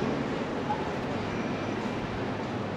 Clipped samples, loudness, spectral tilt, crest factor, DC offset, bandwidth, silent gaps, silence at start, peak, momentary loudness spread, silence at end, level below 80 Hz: under 0.1%; -32 LUFS; -6.5 dB/octave; 14 dB; under 0.1%; 11.5 kHz; none; 0 s; -16 dBFS; 2 LU; 0 s; -52 dBFS